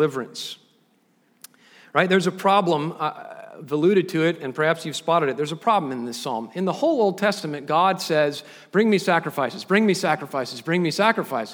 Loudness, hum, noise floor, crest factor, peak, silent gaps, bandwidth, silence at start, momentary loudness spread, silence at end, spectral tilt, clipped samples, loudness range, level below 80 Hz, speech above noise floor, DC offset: -22 LUFS; none; -63 dBFS; 20 dB; -2 dBFS; none; over 20 kHz; 0 s; 10 LU; 0 s; -5 dB/octave; under 0.1%; 2 LU; -76 dBFS; 41 dB; under 0.1%